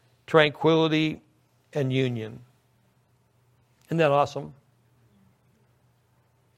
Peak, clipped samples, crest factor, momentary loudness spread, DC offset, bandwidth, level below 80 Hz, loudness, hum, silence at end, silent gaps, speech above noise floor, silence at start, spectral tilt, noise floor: -2 dBFS; under 0.1%; 26 dB; 17 LU; under 0.1%; 12.5 kHz; -68 dBFS; -24 LUFS; none; 2.05 s; none; 42 dB; 0.3 s; -6.5 dB/octave; -65 dBFS